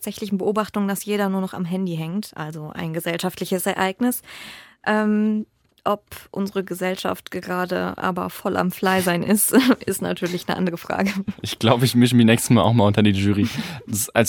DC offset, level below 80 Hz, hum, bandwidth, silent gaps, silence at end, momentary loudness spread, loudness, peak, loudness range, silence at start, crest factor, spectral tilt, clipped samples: under 0.1%; -56 dBFS; none; 18 kHz; none; 0 s; 13 LU; -21 LUFS; -2 dBFS; 7 LU; 0 s; 20 dB; -5 dB/octave; under 0.1%